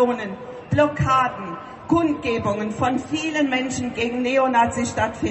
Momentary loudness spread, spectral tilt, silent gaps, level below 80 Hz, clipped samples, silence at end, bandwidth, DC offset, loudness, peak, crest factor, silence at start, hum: 10 LU; -5.5 dB/octave; none; -44 dBFS; under 0.1%; 0 s; 8.6 kHz; under 0.1%; -21 LUFS; -4 dBFS; 16 dB; 0 s; none